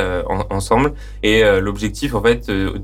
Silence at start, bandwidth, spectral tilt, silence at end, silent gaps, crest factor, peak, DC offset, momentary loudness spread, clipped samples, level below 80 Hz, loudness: 0 s; 16 kHz; -5.5 dB/octave; 0 s; none; 12 dB; -4 dBFS; under 0.1%; 8 LU; under 0.1%; -28 dBFS; -17 LUFS